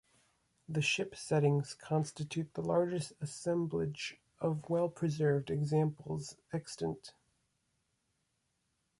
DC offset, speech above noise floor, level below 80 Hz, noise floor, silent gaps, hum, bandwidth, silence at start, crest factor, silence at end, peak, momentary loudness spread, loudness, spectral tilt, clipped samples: under 0.1%; 46 dB; -68 dBFS; -81 dBFS; none; none; 11.5 kHz; 0.7 s; 18 dB; 1.9 s; -18 dBFS; 10 LU; -35 LUFS; -6 dB/octave; under 0.1%